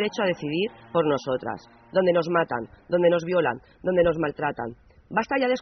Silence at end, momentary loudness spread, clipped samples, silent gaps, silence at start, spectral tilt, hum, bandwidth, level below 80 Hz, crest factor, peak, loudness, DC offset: 0 s; 9 LU; under 0.1%; none; 0 s; -4.5 dB/octave; none; 6.4 kHz; -54 dBFS; 16 dB; -8 dBFS; -25 LUFS; under 0.1%